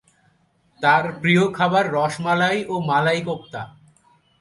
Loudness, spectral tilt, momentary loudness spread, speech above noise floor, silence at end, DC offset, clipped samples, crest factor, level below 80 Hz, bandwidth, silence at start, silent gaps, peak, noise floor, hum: -20 LUFS; -5.5 dB/octave; 12 LU; 42 dB; 0.75 s; under 0.1%; under 0.1%; 18 dB; -62 dBFS; 11.5 kHz; 0.8 s; none; -4 dBFS; -62 dBFS; none